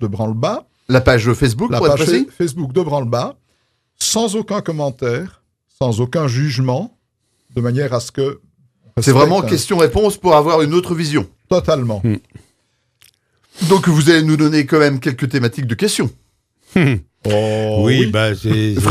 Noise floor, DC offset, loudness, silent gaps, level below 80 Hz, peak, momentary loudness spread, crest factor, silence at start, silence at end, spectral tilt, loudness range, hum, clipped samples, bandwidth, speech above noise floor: -66 dBFS; under 0.1%; -16 LUFS; none; -42 dBFS; 0 dBFS; 10 LU; 16 dB; 0 s; 0 s; -5.5 dB/octave; 5 LU; none; under 0.1%; 15.5 kHz; 51 dB